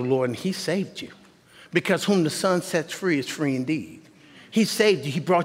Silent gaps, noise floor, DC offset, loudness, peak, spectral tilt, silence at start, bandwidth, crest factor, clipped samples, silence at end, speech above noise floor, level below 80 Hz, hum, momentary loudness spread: none; -51 dBFS; under 0.1%; -24 LUFS; -6 dBFS; -5 dB/octave; 0 s; 16 kHz; 20 dB; under 0.1%; 0 s; 28 dB; -70 dBFS; none; 9 LU